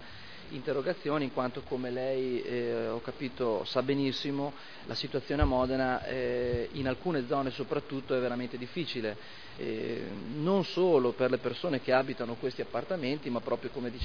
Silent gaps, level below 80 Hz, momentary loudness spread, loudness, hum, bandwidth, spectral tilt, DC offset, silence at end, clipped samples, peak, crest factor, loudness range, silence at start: none; -48 dBFS; 10 LU; -32 LUFS; none; 5.4 kHz; -4.5 dB/octave; 0.4%; 0 s; under 0.1%; -12 dBFS; 20 dB; 4 LU; 0 s